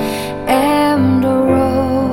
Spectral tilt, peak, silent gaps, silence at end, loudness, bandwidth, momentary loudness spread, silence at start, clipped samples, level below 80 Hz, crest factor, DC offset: -6.5 dB/octave; 0 dBFS; none; 0 s; -14 LUFS; 16.5 kHz; 5 LU; 0 s; under 0.1%; -38 dBFS; 14 dB; under 0.1%